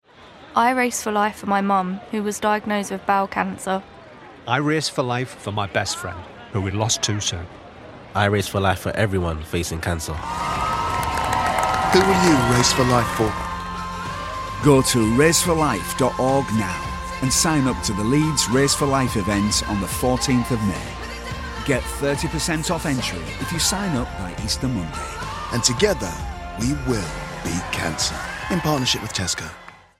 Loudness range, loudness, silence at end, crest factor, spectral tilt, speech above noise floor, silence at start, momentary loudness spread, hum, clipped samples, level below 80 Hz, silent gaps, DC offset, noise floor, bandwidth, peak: 5 LU; -21 LUFS; 0.25 s; 20 dB; -4 dB/octave; 24 dB; 0.2 s; 12 LU; none; under 0.1%; -38 dBFS; none; under 0.1%; -45 dBFS; 16.5 kHz; -2 dBFS